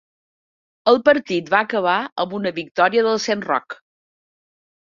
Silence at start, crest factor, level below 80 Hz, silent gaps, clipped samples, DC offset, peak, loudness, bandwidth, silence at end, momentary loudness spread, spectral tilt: 0.85 s; 20 dB; -66 dBFS; 2.12-2.16 s, 2.71-2.75 s; under 0.1%; under 0.1%; 0 dBFS; -19 LUFS; 7.4 kHz; 1.2 s; 9 LU; -4.5 dB/octave